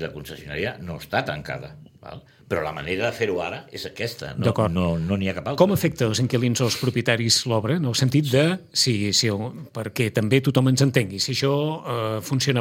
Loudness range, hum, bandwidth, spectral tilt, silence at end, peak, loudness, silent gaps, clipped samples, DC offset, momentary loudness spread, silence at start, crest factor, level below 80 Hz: 7 LU; none; 16.5 kHz; -4.5 dB/octave; 0 s; -2 dBFS; -23 LUFS; none; under 0.1%; under 0.1%; 14 LU; 0 s; 20 dB; -52 dBFS